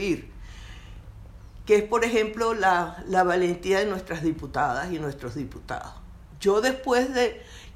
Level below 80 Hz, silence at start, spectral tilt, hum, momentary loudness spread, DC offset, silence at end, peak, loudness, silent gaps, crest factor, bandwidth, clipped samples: -46 dBFS; 0 s; -5 dB/octave; none; 22 LU; under 0.1%; 0 s; -8 dBFS; -25 LUFS; none; 18 dB; 14.5 kHz; under 0.1%